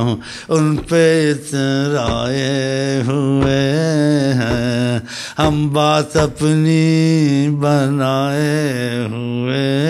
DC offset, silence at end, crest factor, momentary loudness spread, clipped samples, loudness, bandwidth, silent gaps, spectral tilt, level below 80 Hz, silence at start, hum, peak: under 0.1%; 0 s; 14 dB; 6 LU; under 0.1%; -16 LUFS; 14 kHz; none; -6 dB/octave; -40 dBFS; 0 s; none; -2 dBFS